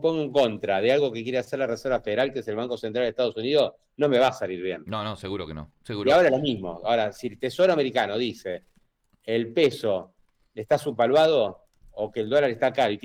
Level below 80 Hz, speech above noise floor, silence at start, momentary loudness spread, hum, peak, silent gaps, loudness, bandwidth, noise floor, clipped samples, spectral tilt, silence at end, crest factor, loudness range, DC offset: -58 dBFS; 41 dB; 0 s; 12 LU; none; -10 dBFS; none; -25 LUFS; 15.5 kHz; -65 dBFS; under 0.1%; -5.5 dB/octave; 0.05 s; 14 dB; 2 LU; under 0.1%